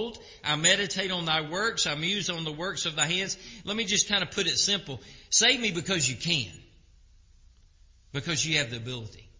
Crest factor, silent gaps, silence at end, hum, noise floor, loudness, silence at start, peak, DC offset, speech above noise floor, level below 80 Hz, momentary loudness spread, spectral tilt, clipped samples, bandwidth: 22 dB; none; 0.15 s; none; -58 dBFS; -26 LUFS; 0 s; -8 dBFS; under 0.1%; 29 dB; -56 dBFS; 14 LU; -2 dB/octave; under 0.1%; 7.8 kHz